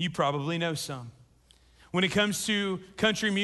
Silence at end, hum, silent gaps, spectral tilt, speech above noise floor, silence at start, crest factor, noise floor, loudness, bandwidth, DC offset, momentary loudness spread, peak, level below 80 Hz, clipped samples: 0 s; none; none; -4 dB/octave; 32 dB; 0 s; 18 dB; -61 dBFS; -28 LUFS; 12.5 kHz; under 0.1%; 11 LU; -12 dBFS; -60 dBFS; under 0.1%